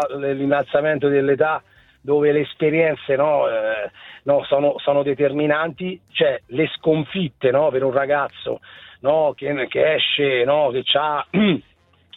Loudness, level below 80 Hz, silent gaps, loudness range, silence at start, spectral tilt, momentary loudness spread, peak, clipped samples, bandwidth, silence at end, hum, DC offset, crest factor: -20 LUFS; -60 dBFS; none; 2 LU; 0 s; -7.5 dB/octave; 8 LU; -4 dBFS; under 0.1%; 4.1 kHz; 0.55 s; none; under 0.1%; 16 dB